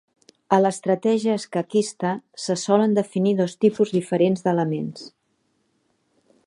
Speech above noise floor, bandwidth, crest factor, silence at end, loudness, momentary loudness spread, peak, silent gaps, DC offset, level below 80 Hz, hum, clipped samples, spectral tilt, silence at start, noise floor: 48 dB; 11.5 kHz; 20 dB; 1.4 s; -22 LUFS; 8 LU; -2 dBFS; none; under 0.1%; -72 dBFS; none; under 0.1%; -6 dB/octave; 0.5 s; -69 dBFS